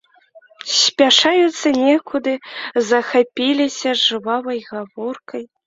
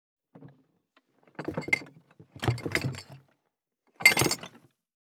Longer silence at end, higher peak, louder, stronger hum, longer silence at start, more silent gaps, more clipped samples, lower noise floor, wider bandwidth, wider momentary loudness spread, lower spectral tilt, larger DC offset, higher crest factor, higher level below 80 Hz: second, 0.2 s vs 0.65 s; about the same, -2 dBFS vs -4 dBFS; first, -16 LUFS vs -27 LUFS; neither; about the same, 0.35 s vs 0.35 s; neither; neither; second, -49 dBFS vs -81 dBFS; second, 7.8 kHz vs over 20 kHz; second, 16 LU vs 22 LU; second, -1.5 dB/octave vs -3 dB/octave; neither; second, 16 dB vs 30 dB; about the same, -64 dBFS vs -62 dBFS